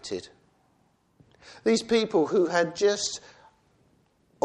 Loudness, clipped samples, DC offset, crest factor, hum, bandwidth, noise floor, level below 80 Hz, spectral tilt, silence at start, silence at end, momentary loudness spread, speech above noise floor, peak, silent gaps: -25 LUFS; under 0.1%; under 0.1%; 18 dB; none; 11.5 kHz; -67 dBFS; -66 dBFS; -3.5 dB/octave; 0.05 s; 1.25 s; 13 LU; 42 dB; -10 dBFS; none